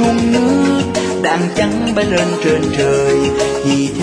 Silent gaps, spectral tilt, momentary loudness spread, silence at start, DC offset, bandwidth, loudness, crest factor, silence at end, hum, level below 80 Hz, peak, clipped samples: none; -5 dB/octave; 3 LU; 0 s; under 0.1%; 10.5 kHz; -14 LUFS; 12 dB; 0 s; none; -38 dBFS; -2 dBFS; under 0.1%